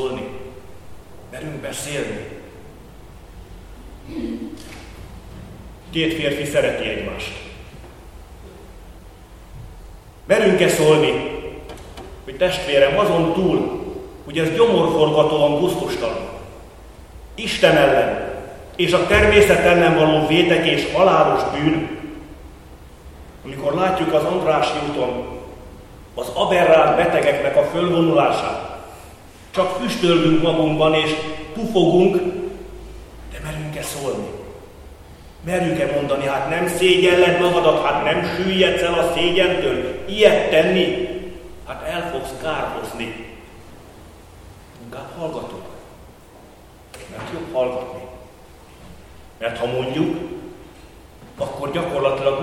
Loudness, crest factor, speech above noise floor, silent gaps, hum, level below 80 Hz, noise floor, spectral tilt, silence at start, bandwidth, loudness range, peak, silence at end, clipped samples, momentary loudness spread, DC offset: -18 LUFS; 20 dB; 27 dB; none; none; -42 dBFS; -44 dBFS; -5 dB/octave; 0 s; 15.5 kHz; 16 LU; 0 dBFS; 0 s; under 0.1%; 23 LU; under 0.1%